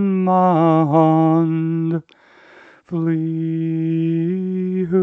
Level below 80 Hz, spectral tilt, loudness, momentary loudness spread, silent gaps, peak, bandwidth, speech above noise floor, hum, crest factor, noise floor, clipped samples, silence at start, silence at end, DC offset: -68 dBFS; -11 dB/octave; -18 LUFS; 8 LU; none; -2 dBFS; 3.9 kHz; 29 dB; none; 16 dB; -46 dBFS; under 0.1%; 0 s; 0 s; under 0.1%